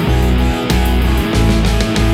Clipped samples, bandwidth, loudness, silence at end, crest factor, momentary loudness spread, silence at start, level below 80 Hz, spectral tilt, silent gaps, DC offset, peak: under 0.1%; 16 kHz; -14 LUFS; 0 s; 12 dB; 2 LU; 0 s; -16 dBFS; -6 dB/octave; none; under 0.1%; -2 dBFS